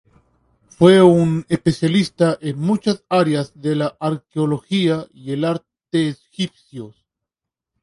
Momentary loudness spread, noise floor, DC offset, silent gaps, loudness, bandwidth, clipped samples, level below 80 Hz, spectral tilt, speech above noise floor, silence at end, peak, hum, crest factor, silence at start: 14 LU; -85 dBFS; under 0.1%; none; -18 LUFS; 11.5 kHz; under 0.1%; -56 dBFS; -7 dB/octave; 68 dB; 0.95 s; 0 dBFS; none; 18 dB; 0.8 s